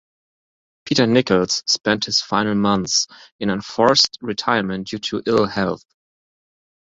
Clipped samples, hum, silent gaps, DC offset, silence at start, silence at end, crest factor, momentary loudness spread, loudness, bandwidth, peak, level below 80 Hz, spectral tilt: under 0.1%; none; 3.32-3.39 s; under 0.1%; 0.85 s; 1.1 s; 20 dB; 9 LU; -19 LUFS; 7.8 kHz; -2 dBFS; -54 dBFS; -3.5 dB/octave